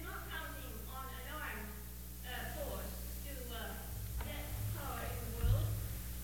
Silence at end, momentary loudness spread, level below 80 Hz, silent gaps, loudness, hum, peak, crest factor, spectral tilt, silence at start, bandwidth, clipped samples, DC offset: 0 s; 10 LU; -46 dBFS; none; -43 LUFS; 60 Hz at -45 dBFS; -22 dBFS; 20 dB; -4.5 dB/octave; 0 s; over 20 kHz; under 0.1%; 0.1%